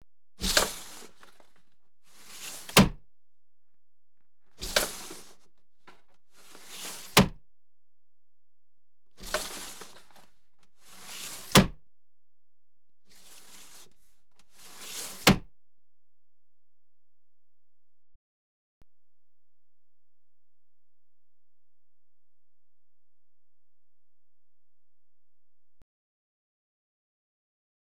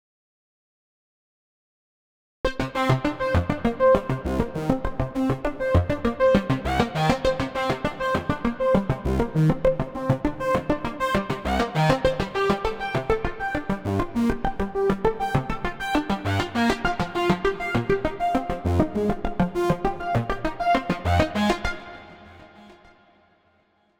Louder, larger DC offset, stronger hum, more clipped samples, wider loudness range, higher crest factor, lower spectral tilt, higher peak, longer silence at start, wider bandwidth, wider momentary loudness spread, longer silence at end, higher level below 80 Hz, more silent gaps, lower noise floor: about the same, -26 LUFS vs -24 LUFS; first, 0.5% vs under 0.1%; neither; neither; first, 11 LU vs 3 LU; first, 30 dB vs 20 dB; second, -3.5 dB/octave vs -7 dB/octave; about the same, -4 dBFS vs -6 dBFS; second, 0.4 s vs 2.45 s; about the same, over 20 kHz vs 19.5 kHz; first, 26 LU vs 6 LU; first, 12.4 s vs 1.25 s; second, -50 dBFS vs -38 dBFS; neither; first, under -90 dBFS vs -64 dBFS